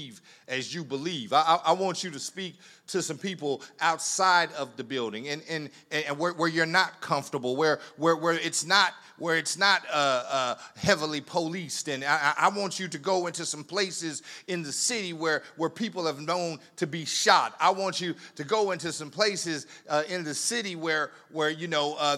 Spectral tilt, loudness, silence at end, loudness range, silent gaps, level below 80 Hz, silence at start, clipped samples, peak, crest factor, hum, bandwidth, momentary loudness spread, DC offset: -2.5 dB/octave; -27 LUFS; 0 s; 4 LU; none; -76 dBFS; 0 s; under 0.1%; -4 dBFS; 24 dB; none; 16 kHz; 11 LU; under 0.1%